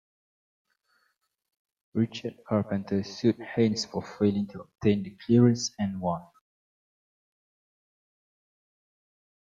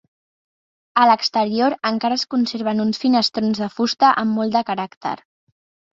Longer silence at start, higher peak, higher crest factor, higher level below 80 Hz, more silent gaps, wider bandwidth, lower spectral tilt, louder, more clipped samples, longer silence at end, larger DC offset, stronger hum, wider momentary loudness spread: first, 1.95 s vs 0.95 s; second, -10 dBFS vs -2 dBFS; about the same, 20 dB vs 18 dB; about the same, -66 dBFS vs -64 dBFS; second, none vs 4.97-5.01 s; about the same, 7.8 kHz vs 7.8 kHz; first, -6.5 dB/octave vs -4.5 dB/octave; second, -28 LUFS vs -19 LUFS; neither; first, 3.3 s vs 0.8 s; neither; neither; about the same, 11 LU vs 10 LU